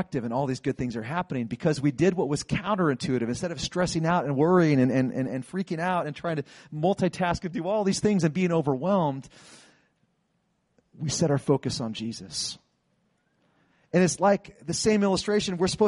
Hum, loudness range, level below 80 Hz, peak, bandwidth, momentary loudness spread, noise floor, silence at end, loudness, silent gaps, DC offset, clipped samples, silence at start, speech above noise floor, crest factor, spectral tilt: none; 5 LU; -54 dBFS; -10 dBFS; 11.5 kHz; 9 LU; -73 dBFS; 0 s; -26 LUFS; none; under 0.1%; under 0.1%; 0 s; 47 dB; 18 dB; -5.5 dB/octave